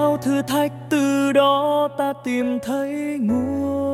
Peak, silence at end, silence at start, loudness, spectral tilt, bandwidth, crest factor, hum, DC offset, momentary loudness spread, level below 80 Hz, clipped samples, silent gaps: -4 dBFS; 0 s; 0 s; -21 LUFS; -5.5 dB/octave; 15.5 kHz; 16 dB; none; under 0.1%; 7 LU; -60 dBFS; under 0.1%; none